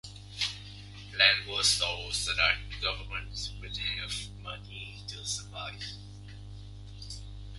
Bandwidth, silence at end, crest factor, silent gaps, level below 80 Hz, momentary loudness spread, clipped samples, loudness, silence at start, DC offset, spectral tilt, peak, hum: 12 kHz; 0 s; 26 dB; none; -48 dBFS; 22 LU; under 0.1%; -29 LUFS; 0.05 s; under 0.1%; -1 dB/octave; -8 dBFS; 50 Hz at -45 dBFS